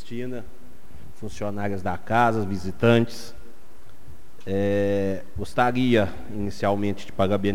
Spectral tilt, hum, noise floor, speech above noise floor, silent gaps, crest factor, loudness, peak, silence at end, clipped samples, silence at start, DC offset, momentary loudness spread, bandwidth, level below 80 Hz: -7 dB/octave; none; -51 dBFS; 27 dB; none; 20 dB; -24 LUFS; -6 dBFS; 0 s; under 0.1%; 0.05 s; 4%; 16 LU; 16 kHz; -50 dBFS